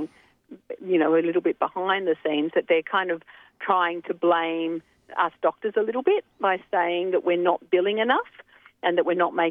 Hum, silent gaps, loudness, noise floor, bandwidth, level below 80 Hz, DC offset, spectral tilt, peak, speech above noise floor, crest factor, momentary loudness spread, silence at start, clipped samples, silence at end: none; none; -24 LUFS; -49 dBFS; 3.9 kHz; -76 dBFS; under 0.1%; -7.5 dB/octave; -8 dBFS; 25 dB; 18 dB; 8 LU; 0 s; under 0.1%; 0 s